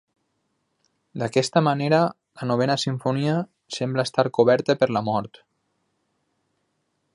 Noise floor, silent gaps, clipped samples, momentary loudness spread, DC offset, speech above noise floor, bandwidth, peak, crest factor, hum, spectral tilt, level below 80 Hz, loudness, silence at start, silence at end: -73 dBFS; none; under 0.1%; 11 LU; under 0.1%; 51 dB; 11.5 kHz; -4 dBFS; 22 dB; none; -6 dB/octave; -66 dBFS; -23 LUFS; 1.15 s; 1.9 s